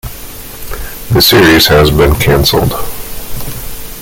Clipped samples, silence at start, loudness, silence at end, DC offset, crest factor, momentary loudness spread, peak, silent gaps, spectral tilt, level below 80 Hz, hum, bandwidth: under 0.1%; 0.05 s; -7 LUFS; 0 s; under 0.1%; 10 dB; 20 LU; 0 dBFS; none; -4.5 dB/octave; -22 dBFS; none; 17.5 kHz